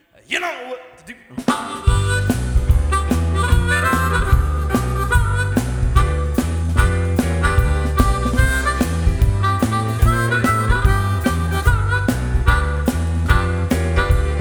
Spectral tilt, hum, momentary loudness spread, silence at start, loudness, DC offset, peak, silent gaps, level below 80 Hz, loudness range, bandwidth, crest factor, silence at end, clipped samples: -6 dB/octave; none; 4 LU; 0.3 s; -18 LUFS; under 0.1%; -2 dBFS; none; -20 dBFS; 1 LU; over 20 kHz; 16 dB; 0 s; under 0.1%